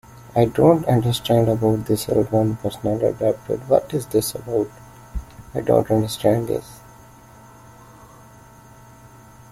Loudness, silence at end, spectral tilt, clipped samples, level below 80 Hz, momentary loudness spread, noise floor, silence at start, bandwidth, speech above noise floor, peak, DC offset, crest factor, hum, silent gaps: -20 LUFS; 2.75 s; -6.5 dB/octave; under 0.1%; -44 dBFS; 11 LU; -46 dBFS; 0.15 s; 16 kHz; 27 dB; -2 dBFS; under 0.1%; 20 dB; none; none